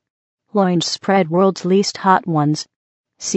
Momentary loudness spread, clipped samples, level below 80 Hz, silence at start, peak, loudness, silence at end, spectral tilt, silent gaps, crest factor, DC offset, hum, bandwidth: 9 LU; under 0.1%; -68 dBFS; 0.55 s; 0 dBFS; -17 LUFS; 0 s; -5 dB/octave; 2.76-3.04 s; 18 dB; under 0.1%; none; 8.4 kHz